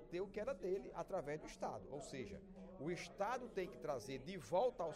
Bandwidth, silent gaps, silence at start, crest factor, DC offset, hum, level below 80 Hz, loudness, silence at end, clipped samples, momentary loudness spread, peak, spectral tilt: 15.5 kHz; none; 0 s; 18 dB; under 0.1%; none; -66 dBFS; -46 LUFS; 0 s; under 0.1%; 10 LU; -26 dBFS; -5.5 dB/octave